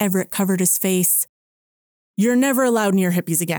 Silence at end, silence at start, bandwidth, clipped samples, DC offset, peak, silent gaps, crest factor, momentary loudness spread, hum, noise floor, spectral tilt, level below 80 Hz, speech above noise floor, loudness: 0 s; 0 s; over 20 kHz; under 0.1%; under 0.1%; -4 dBFS; 1.29-2.14 s; 14 dB; 5 LU; none; under -90 dBFS; -4.5 dB/octave; -70 dBFS; over 72 dB; -18 LUFS